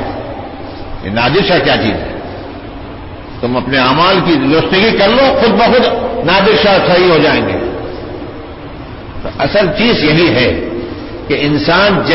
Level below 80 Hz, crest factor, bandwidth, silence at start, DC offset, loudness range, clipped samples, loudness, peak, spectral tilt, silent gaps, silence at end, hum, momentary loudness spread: -32 dBFS; 12 dB; 6 kHz; 0 s; under 0.1%; 5 LU; under 0.1%; -10 LUFS; 0 dBFS; -8.5 dB/octave; none; 0 s; none; 18 LU